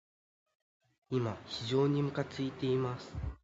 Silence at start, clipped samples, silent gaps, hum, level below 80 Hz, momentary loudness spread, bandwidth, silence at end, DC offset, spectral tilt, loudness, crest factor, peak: 1.1 s; under 0.1%; none; none; -52 dBFS; 9 LU; 7.8 kHz; 0.1 s; under 0.1%; -7 dB/octave; -35 LUFS; 18 dB; -18 dBFS